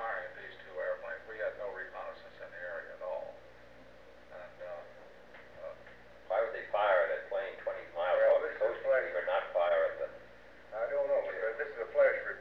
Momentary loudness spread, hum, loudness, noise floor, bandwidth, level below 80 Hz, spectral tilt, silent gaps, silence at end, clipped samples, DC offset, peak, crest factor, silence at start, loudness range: 22 LU; 60 Hz at -70 dBFS; -34 LUFS; -56 dBFS; 5.8 kHz; -70 dBFS; -5 dB/octave; none; 0 s; under 0.1%; 0.1%; -16 dBFS; 18 dB; 0 s; 14 LU